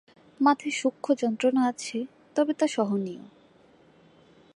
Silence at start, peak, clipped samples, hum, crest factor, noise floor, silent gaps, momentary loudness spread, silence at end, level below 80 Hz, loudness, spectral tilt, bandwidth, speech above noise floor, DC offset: 0.4 s; -8 dBFS; under 0.1%; none; 20 dB; -58 dBFS; none; 10 LU; 1.3 s; -78 dBFS; -27 LUFS; -4.5 dB/octave; 11 kHz; 32 dB; under 0.1%